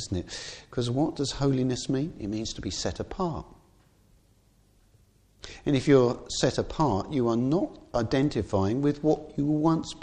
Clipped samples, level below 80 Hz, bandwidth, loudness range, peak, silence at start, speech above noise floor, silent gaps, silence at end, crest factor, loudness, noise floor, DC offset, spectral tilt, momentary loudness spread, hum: under 0.1%; -48 dBFS; 9.8 kHz; 9 LU; -8 dBFS; 0 s; 35 dB; none; 0 s; 20 dB; -27 LUFS; -62 dBFS; under 0.1%; -6 dB/octave; 9 LU; none